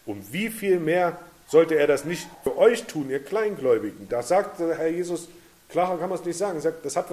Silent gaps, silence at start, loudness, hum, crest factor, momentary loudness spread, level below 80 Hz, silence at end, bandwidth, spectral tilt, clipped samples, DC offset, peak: none; 0.05 s; -25 LUFS; none; 18 dB; 10 LU; -62 dBFS; 0 s; 15 kHz; -5 dB/octave; under 0.1%; under 0.1%; -6 dBFS